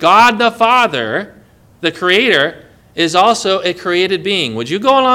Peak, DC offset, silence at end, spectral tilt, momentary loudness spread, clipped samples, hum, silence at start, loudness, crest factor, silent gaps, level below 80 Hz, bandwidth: 0 dBFS; under 0.1%; 0 s; -3.5 dB/octave; 10 LU; 0.5%; none; 0 s; -13 LUFS; 14 dB; none; -54 dBFS; over 20 kHz